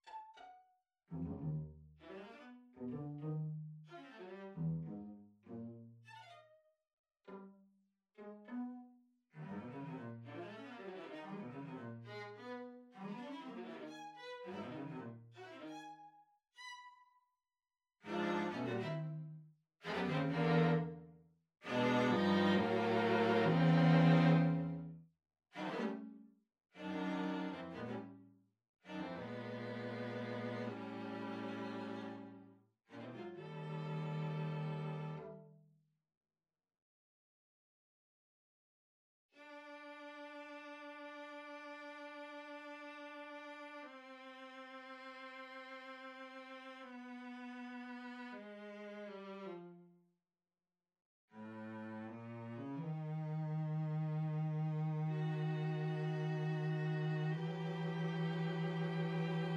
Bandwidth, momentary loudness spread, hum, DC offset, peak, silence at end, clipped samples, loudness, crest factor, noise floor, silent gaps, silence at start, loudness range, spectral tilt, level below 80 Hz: 7.2 kHz; 21 LU; none; under 0.1%; -18 dBFS; 0 s; under 0.1%; -41 LUFS; 22 dB; under -90 dBFS; 6.93-7.04 s, 28.69-28.74 s, 36.17-36.21 s, 36.82-39.29 s, 51.05-51.28 s; 0.05 s; 18 LU; -8 dB/octave; -76 dBFS